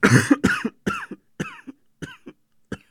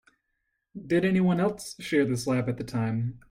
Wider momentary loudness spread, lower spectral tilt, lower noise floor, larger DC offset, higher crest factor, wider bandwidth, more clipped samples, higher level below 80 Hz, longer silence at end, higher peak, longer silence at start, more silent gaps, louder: first, 23 LU vs 11 LU; about the same, -5.5 dB/octave vs -6.5 dB/octave; second, -48 dBFS vs -79 dBFS; neither; first, 24 dB vs 16 dB; about the same, 16 kHz vs 15.5 kHz; neither; first, -50 dBFS vs -58 dBFS; about the same, 0.15 s vs 0.1 s; first, 0 dBFS vs -12 dBFS; second, 0 s vs 0.75 s; neither; first, -22 LUFS vs -27 LUFS